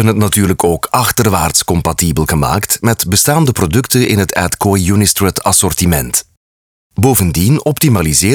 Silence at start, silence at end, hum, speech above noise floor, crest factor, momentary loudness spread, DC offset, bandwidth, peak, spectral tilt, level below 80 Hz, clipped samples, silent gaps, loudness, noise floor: 0 s; 0 s; none; over 79 dB; 12 dB; 3 LU; 0.2%; over 20 kHz; 0 dBFS; -4.5 dB/octave; -32 dBFS; under 0.1%; 6.37-6.90 s; -11 LUFS; under -90 dBFS